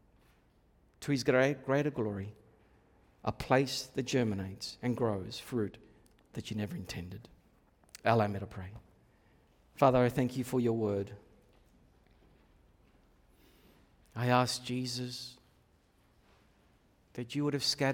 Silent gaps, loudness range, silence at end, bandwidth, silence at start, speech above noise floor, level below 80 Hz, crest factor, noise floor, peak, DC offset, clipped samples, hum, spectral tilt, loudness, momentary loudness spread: none; 6 LU; 0 s; 18 kHz; 1 s; 36 dB; -64 dBFS; 24 dB; -68 dBFS; -12 dBFS; under 0.1%; under 0.1%; none; -5.5 dB/octave; -33 LUFS; 18 LU